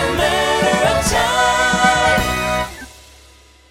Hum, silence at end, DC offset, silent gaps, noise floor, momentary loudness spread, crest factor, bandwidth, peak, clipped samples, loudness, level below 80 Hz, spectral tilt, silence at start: none; 0.8 s; under 0.1%; none; -46 dBFS; 7 LU; 16 dB; 16.5 kHz; -2 dBFS; under 0.1%; -15 LUFS; -32 dBFS; -3 dB/octave; 0 s